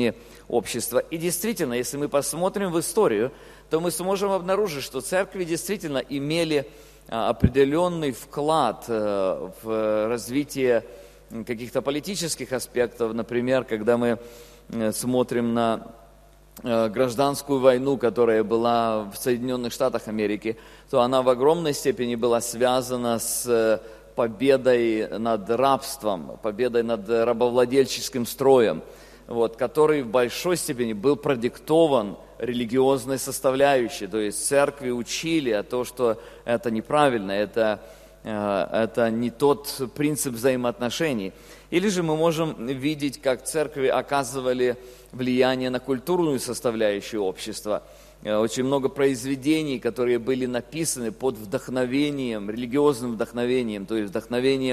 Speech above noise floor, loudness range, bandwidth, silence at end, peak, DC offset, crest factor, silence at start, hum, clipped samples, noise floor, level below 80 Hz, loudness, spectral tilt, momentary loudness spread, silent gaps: 28 dB; 3 LU; 14.5 kHz; 0 s; -4 dBFS; under 0.1%; 20 dB; 0 s; none; under 0.1%; -52 dBFS; -52 dBFS; -24 LUFS; -4.5 dB/octave; 8 LU; none